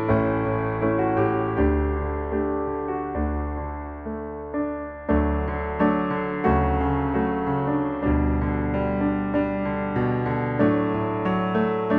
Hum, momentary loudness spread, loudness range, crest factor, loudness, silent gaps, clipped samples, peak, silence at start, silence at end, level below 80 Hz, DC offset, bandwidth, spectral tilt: none; 7 LU; 4 LU; 16 dB; -24 LUFS; none; under 0.1%; -8 dBFS; 0 s; 0 s; -32 dBFS; under 0.1%; 4.5 kHz; -11 dB/octave